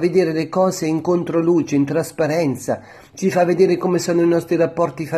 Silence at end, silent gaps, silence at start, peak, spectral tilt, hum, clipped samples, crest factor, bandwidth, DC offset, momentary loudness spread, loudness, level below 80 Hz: 0 s; none; 0 s; -2 dBFS; -6.5 dB/octave; none; under 0.1%; 16 dB; 13.5 kHz; under 0.1%; 6 LU; -18 LUFS; -60 dBFS